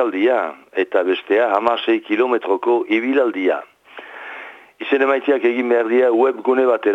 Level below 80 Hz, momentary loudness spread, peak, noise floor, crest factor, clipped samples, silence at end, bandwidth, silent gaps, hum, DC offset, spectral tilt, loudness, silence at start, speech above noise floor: -74 dBFS; 16 LU; -2 dBFS; -38 dBFS; 16 dB; under 0.1%; 0 s; 5.8 kHz; none; none; under 0.1%; -5.5 dB/octave; -18 LUFS; 0 s; 21 dB